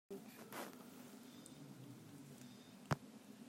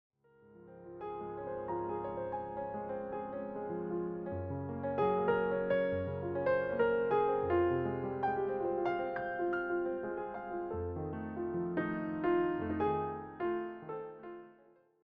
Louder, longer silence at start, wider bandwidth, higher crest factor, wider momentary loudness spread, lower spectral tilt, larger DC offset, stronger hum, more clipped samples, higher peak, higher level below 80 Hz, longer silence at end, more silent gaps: second, -52 LUFS vs -36 LUFS; second, 0.1 s vs 0.5 s; first, 16 kHz vs 5.2 kHz; first, 32 dB vs 16 dB; about the same, 12 LU vs 11 LU; second, -5 dB/octave vs -6.5 dB/octave; neither; neither; neither; about the same, -20 dBFS vs -20 dBFS; second, -84 dBFS vs -62 dBFS; second, 0 s vs 0.55 s; neither